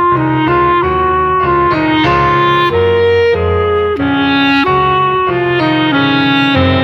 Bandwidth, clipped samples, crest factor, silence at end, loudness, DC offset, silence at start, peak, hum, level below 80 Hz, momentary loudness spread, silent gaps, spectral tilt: 6.8 kHz; under 0.1%; 10 dB; 0 s; -11 LUFS; under 0.1%; 0 s; 0 dBFS; none; -32 dBFS; 3 LU; none; -7.5 dB/octave